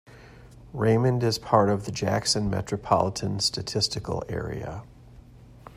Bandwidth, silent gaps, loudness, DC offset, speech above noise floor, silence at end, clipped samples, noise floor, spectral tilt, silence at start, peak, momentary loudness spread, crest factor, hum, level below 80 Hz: 15.5 kHz; none; -25 LUFS; under 0.1%; 23 dB; 0 s; under 0.1%; -49 dBFS; -5 dB/octave; 0.1 s; -6 dBFS; 11 LU; 20 dB; none; -50 dBFS